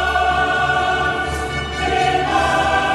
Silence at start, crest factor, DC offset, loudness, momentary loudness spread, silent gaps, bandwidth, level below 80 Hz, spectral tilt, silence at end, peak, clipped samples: 0 s; 14 dB; under 0.1%; -17 LUFS; 6 LU; none; 13 kHz; -32 dBFS; -4 dB/octave; 0 s; -4 dBFS; under 0.1%